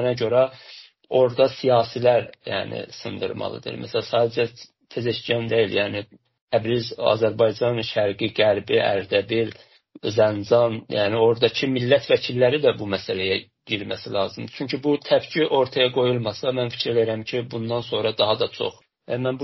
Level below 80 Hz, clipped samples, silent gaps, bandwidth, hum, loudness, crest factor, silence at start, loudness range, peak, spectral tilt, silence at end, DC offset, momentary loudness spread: -62 dBFS; under 0.1%; 6.41-6.47 s; 6.2 kHz; none; -22 LUFS; 18 dB; 0 s; 4 LU; -4 dBFS; -3.5 dB/octave; 0 s; under 0.1%; 10 LU